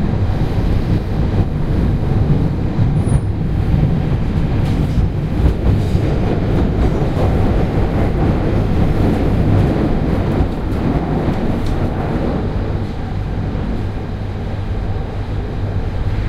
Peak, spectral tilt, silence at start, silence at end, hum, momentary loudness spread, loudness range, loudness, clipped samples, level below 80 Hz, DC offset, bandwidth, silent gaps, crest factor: 0 dBFS; -9 dB/octave; 0 s; 0 s; none; 7 LU; 5 LU; -18 LUFS; under 0.1%; -20 dBFS; under 0.1%; 10.5 kHz; none; 14 dB